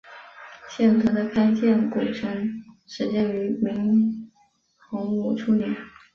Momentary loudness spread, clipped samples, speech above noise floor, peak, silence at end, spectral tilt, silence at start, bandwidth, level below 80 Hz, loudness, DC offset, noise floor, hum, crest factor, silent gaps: 19 LU; under 0.1%; 41 dB; -8 dBFS; 0.25 s; -7.5 dB/octave; 0.05 s; 6.6 kHz; -60 dBFS; -23 LUFS; under 0.1%; -64 dBFS; none; 14 dB; none